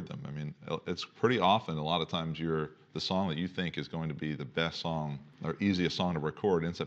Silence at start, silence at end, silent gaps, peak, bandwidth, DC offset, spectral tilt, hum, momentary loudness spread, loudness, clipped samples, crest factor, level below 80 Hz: 0 s; 0 s; none; -12 dBFS; 8 kHz; under 0.1%; -6 dB/octave; none; 11 LU; -33 LUFS; under 0.1%; 22 dB; -62 dBFS